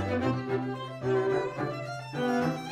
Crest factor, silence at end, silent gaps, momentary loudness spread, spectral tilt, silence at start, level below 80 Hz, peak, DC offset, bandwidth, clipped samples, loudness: 14 dB; 0 s; none; 8 LU; -7 dB/octave; 0 s; -62 dBFS; -16 dBFS; under 0.1%; 14 kHz; under 0.1%; -31 LUFS